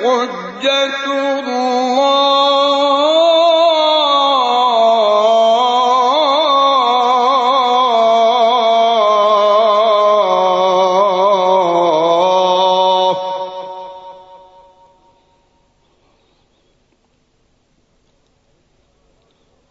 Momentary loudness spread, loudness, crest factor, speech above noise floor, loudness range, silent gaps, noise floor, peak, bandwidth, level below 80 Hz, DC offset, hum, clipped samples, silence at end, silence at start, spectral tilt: 6 LU; -12 LUFS; 12 dB; 45 dB; 5 LU; none; -59 dBFS; -2 dBFS; 8 kHz; -64 dBFS; under 0.1%; none; under 0.1%; 5.35 s; 0 s; -3 dB/octave